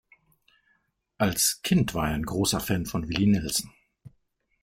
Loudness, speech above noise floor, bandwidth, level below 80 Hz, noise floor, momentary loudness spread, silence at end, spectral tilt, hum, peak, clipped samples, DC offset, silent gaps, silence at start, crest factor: -26 LUFS; 46 dB; 16.5 kHz; -48 dBFS; -71 dBFS; 6 LU; 0.55 s; -4 dB/octave; none; -8 dBFS; under 0.1%; under 0.1%; none; 1.2 s; 20 dB